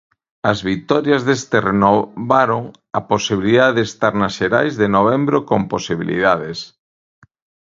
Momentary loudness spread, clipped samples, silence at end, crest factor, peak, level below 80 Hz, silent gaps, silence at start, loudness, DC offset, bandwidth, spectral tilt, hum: 8 LU; under 0.1%; 1 s; 18 dB; 0 dBFS; -50 dBFS; none; 0.45 s; -17 LUFS; under 0.1%; 7.8 kHz; -5.5 dB/octave; none